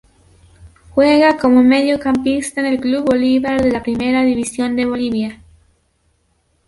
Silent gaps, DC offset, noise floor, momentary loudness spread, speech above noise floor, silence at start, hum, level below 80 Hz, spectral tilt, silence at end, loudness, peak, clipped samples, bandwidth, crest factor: none; under 0.1%; -62 dBFS; 8 LU; 47 dB; 0.65 s; none; -44 dBFS; -4.5 dB/octave; 1.35 s; -15 LUFS; -2 dBFS; under 0.1%; 11.5 kHz; 14 dB